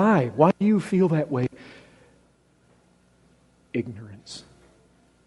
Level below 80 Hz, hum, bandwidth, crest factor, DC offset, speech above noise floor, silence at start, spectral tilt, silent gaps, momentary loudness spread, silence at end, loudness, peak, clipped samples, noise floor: -64 dBFS; 60 Hz at -55 dBFS; 11.5 kHz; 22 dB; under 0.1%; 38 dB; 0 s; -8 dB/octave; none; 22 LU; 0.85 s; -23 LUFS; -4 dBFS; under 0.1%; -61 dBFS